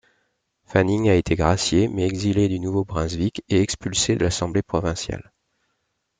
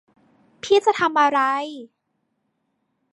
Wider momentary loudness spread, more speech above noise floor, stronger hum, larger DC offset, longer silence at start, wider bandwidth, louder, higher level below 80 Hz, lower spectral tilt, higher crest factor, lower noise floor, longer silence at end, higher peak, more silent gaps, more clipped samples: second, 7 LU vs 18 LU; about the same, 53 dB vs 54 dB; neither; neither; about the same, 0.7 s vs 0.65 s; second, 9.6 kHz vs 11 kHz; second, -22 LUFS vs -19 LUFS; first, -42 dBFS vs -70 dBFS; first, -5 dB/octave vs -3 dB/octave; about the same, 20 dB vs 18 dB; about the same, -74 dBFS vs -73 dBFS; second, 1 s vs 1.3 s; about the same, -4 dBFS vs -4 dBFS; neither; neither